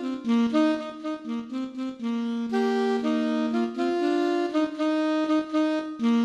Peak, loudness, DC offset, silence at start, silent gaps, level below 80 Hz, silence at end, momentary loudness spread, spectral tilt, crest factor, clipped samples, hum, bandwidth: -12 dBFS; -26 LUFS; under 0.1%; 0 s; none; -70 dBFS; 0 s; 8 LU; -5.5 dB/octave; 14 dB; under 0.1%; none; 9.8 kHz